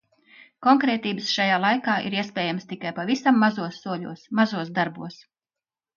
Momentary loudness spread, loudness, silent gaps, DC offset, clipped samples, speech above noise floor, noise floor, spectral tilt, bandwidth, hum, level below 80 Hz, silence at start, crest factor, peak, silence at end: 12 LU; -23 LUFS; none; under 0.1%; under 0.1%; over 67 dB; under -90 dBFS; -5 dB/octave; 7.2 kHz; none; -72 dBFS; 0.6 s; 18 dB; -6 dBFS; 0.8 s